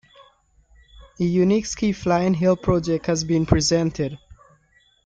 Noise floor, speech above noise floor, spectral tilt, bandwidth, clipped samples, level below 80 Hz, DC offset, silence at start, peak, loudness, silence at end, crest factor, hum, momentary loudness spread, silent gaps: -60 dBFS; 40 dB; -5.5 dB/octave; 9.2 kHz; under 0.1%; -42 dBFS; under 0.1%; 1 s; -2 dBFS; -21 LUFS; 0.9 s; 20 dB; none; 7 LU; none